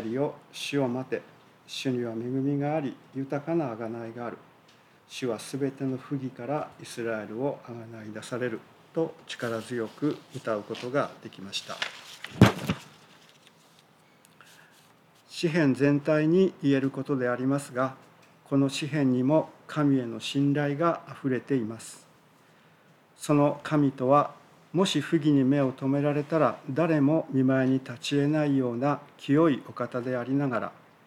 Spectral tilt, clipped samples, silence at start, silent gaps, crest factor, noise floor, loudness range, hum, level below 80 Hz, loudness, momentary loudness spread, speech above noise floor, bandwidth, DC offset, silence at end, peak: -6.5 dB/octave; under 0.1%; 0 s; none; 24 dB; -59 dBFS; 8 LU; none; -66 dBFS; -28 LUFS; 13 LU; 32 dB; 14.5 kHz; under 0.1%; 0.35 s; -4 dBFS